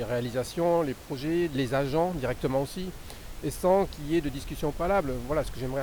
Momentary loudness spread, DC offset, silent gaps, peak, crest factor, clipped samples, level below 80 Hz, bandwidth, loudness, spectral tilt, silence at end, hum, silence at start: 10 LU; under 0.1%; none; -12 dBFS; 16 dB; under 0.1%; -42 dBFS; over 20 kHz; -29 LUFS; -6 dB/octave; 0 s; none; 0 s